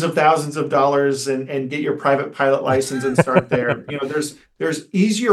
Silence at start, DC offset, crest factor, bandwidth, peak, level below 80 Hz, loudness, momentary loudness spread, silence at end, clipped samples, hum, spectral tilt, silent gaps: 0 s; under 0.1%; 18 dB; 12.5 kHz; 0 dBFS; -60 dBFS; -19 LUFS; 8 LU; 0 s; under 0.1%; none; -5.5 dB/octave; none